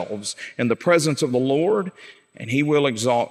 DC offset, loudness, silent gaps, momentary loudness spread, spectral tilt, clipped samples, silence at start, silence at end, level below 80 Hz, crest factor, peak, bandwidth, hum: under 0.1%; -21 LUFS; none; 11 LU; -5 dB/octave; under 0.1%; 0 s; 0 s; -72 dBFS; 16 dB; -6 dBFS; 15 kHz; none